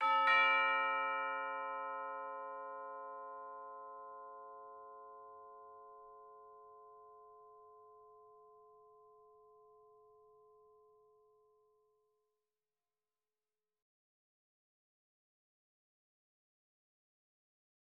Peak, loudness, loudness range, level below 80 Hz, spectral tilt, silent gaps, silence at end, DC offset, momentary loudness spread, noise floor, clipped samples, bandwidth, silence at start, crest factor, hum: -20 dBFS; -36 LUFS; 26 LU; under -90 dBFS; 4 dB/octave; none; 9.25 s; under 0.1%; 29 LU; under -90 dBFS; under 0.1%; 5.8 kHz; 0 s; 24 dB; none